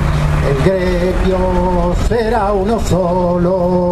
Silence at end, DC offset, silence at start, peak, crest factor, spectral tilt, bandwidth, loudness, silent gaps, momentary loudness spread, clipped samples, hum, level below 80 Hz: 0 s; under 0.1%; 0 s; 0 dBFS; 12 dB; -7.5 dB/octave; 13.5 kHz; -14 LUFS; none; 2 LU; under 0.1%; none; -20 dBFS